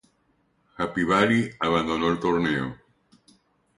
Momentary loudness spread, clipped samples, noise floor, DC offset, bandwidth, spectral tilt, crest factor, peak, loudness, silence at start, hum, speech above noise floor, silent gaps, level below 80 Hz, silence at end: 9 LU; under 0.1%; -68 dBFS; under 0.1%; 11.5 kHz; -6 dB/octave; 22 dB; -4 dBFS; -24 LUFS; 0.8 s; none; 44 dB; none; -54 dBFS; 1.05 s